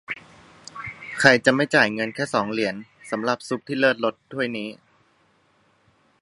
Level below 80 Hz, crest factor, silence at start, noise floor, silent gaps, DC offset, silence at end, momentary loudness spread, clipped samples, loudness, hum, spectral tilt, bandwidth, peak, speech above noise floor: -66 dBFS; 24 dB; 0.1 s; -62 dBFS; none; under 0.1%; 1.45 s; 18 LU; under 0.1%; -22 LUFS; none; -4.5 dB/octave; 11.5 kHz; 0 dBFS; 41 dB